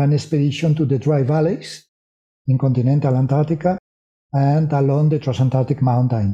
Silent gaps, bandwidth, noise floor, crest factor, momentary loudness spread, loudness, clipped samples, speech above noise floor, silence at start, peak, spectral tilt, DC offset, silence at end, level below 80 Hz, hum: 1.89-2.45 s, 3.79-4.30 s; 8.8 kHz; under -90 dBFS; 14 dB; 7 LU; -18 LUFS; under 0.1%; over 73 dB; 0 s; -4 dBFS; -8.5 dB/octave; under 0.1%; 0 s; -54 dBFS; none